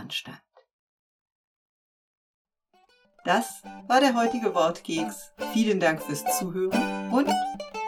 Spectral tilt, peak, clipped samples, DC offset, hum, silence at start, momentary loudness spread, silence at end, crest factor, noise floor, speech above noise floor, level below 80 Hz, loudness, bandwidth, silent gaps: -4 dB/octave; -8 dBFS; under 0.1%; under 0.1%; none; 0 s; 12 LU; 0 s; 20 dB; -65 dBFS; 39 dB; -66 dBFS; -26 LUFS; 19 kHz; 0.73-1.26 s, 1.32-2.45 s